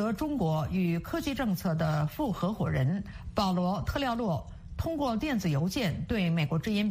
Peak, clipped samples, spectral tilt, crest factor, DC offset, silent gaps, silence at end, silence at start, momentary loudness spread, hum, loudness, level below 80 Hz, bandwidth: -14 dBFS; under 0.1%; -6.5 dB/octave; 14 dB; under 0.1%; none; 0 s; 0 s; 5 LU; none; -30 LUFS; -46 dBFS; 15.5 kHz